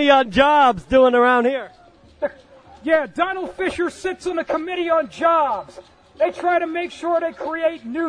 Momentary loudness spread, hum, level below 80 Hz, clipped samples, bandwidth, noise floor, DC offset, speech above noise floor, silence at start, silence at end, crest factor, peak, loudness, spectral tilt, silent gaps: 14 LU; none; -48 dBFS; under 0.1%; 10.5 kHz; -46 dBFS; under 0.1%; 27 dB; 0 s; 0 s; 18 dB; -2 dBFS; -19 LUFS; -4.5 dB/octave; none